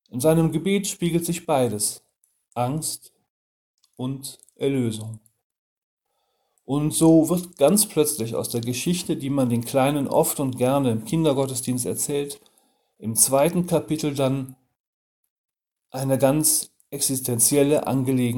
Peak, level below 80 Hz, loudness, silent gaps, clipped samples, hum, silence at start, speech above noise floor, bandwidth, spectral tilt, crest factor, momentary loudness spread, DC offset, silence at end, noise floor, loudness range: 0 dBFS; -56 dBFS; -22 LUFS; 3.30-3.78 s, 5.44-5.50 s, 5.58-5.97 s, 14.80-15.23 s, 15.30-15.44 s; under 0.1%; none; 0.15 s; 51 dB; 19 kHz; -5 dB/octave; 22 dB; 14 LU; under 0.1%; 0 s; -73 dBFS; 8 LU